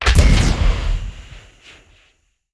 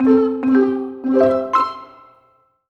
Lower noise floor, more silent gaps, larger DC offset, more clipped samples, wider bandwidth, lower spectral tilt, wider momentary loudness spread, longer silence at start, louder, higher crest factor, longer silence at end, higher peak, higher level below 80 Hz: about the same, -61 dBFS vs -58 dBFS; neither; neither; neither; first, 11 kHz vs 6.4 kHz; second, -5 dB/octave vs -7.5 dB/octave; first, 20 LU vs 8 LU; about the same, 0 s vs 0 s; about the same, -18 LUFS vs -17 LUFS; about the same, 16 dB vs 14 dB; first, 1.15 s vs 0.85 s; about the same, 0 dBFS vs -2 dBFS; first, -18 dBFS vs -60 dBFS